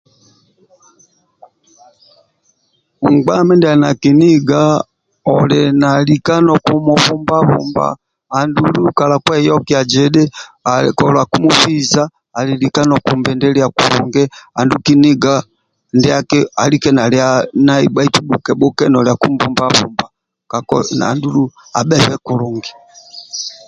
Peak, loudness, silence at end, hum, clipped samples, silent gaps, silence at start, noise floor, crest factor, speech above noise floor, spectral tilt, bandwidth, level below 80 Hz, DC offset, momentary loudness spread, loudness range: 0 dBFS; -12 LUFS; 0.15 s; none; under 0.1%; none; 3 s; -62 dBFS; 12 dB; 50 dB; -5.5 dB/octave; 11 kHz; -48 dBFS; under 0.1%; 9 LU; 4 LU